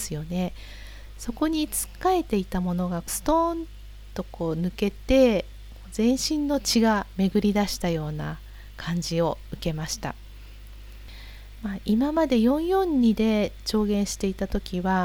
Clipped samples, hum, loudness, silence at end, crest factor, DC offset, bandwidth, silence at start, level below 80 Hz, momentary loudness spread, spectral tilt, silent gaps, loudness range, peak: under 0.1%; none; -25 LUFS; 0 s; 18 dB; under 0.1%; over 20 kHz; 0 s; -40 dBFS; 22 LU; -5 dB/octave; none; 7 LU; -8 dBFS